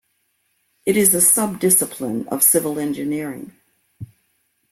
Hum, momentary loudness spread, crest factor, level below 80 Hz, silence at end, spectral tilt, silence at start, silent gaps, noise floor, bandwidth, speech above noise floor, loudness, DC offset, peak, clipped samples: none; 14 LU; 20 dB; -60 dBFS; 0.65 s; -3.5 dB/octave; 0.85 s; none; -68 dBFS; 16.5 kHz; 49 dB; -16 LUFS; under 0.1%; 0 dBFS; under 0.1%